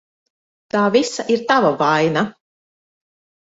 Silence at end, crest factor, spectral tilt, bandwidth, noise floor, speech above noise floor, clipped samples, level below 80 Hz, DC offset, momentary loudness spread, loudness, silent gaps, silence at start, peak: 1.1 s; 18 dB; -5 dB/octave; 8 kHz; under -90 dBFS; over 74 dB; under 0.1%; -64 dBFS; under 0.1%; 7 LU; -17 LUFS; none; 0.75 s; -2 dBFS